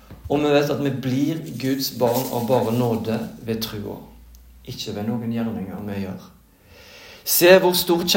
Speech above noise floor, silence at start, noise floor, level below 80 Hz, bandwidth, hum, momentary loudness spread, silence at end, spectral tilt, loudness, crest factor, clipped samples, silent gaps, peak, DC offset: 28 dB; 0.1 s; -49 dBFS; -52 dBFS; 17 kHz; none; 17 LU; 0 s; -4.5 dB/octave; -21 LUFS; 22 dB; under 0.1%; none; 0 dBFS; under 0.1%